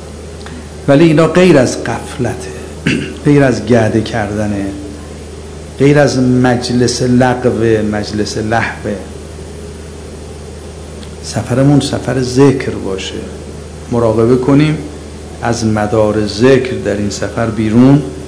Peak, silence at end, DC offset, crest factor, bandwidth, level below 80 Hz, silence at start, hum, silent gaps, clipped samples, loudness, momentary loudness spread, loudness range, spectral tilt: 0 dBFS; 0 s; under 0.1%; 12 dB; 11 kHz; -32 dBFS; 0 s; none; none; 1%; -12 LUFS; 20 LU; 6 LU; -6 dB/octave